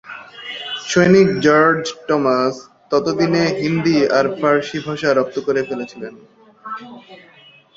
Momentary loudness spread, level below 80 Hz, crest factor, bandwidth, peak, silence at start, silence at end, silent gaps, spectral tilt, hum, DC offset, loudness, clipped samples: 19 LU; -56 dBFS; 16 dB; 7.8 kHz; -2 dBFS; 0.05 s; 0.6 s; none; -5.5 dB/octave; none; under 0.1%; -16 LUFS; under 0.1%